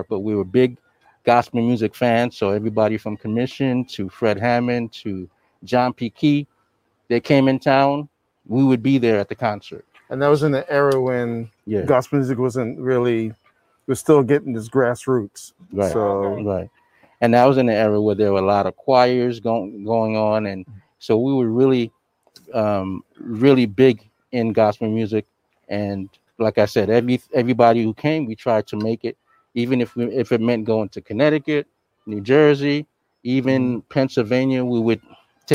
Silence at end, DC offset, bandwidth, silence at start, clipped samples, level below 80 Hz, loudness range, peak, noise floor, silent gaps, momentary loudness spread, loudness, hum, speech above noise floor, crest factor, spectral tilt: 0 s; under 0.1%; 15 kHz; 0 s; under 0.1%; -60 dBFS; 3 LU; 0 dBFS; -67 dBFS; none; 13 LU; -19 LUFS; none; 48 dB; 18 dB; -7 dB/octave